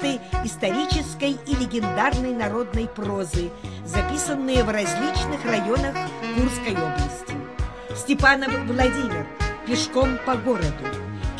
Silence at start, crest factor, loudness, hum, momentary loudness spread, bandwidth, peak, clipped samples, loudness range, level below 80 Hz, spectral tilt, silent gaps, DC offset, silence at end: 0 s; 20 dB; -24 LUFS; none; 9 LU; 11 kHz; -4 dBFS; under 0.1%; 3 LU; -32 dBFS; -5 dB/octave; none; 0.2%; 0 s